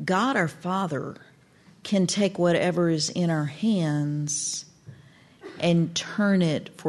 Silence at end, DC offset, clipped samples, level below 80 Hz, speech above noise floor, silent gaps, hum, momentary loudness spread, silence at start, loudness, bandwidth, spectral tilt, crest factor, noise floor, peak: 0 s; under 0.1%; under 0.1%; -68 dBFS; 31 dB; none; none; 8 LU; 0 s; -25 LUFS; 12 kHz; -5 dB/octave; 14 dB; -55 dBFS; -10 dBFS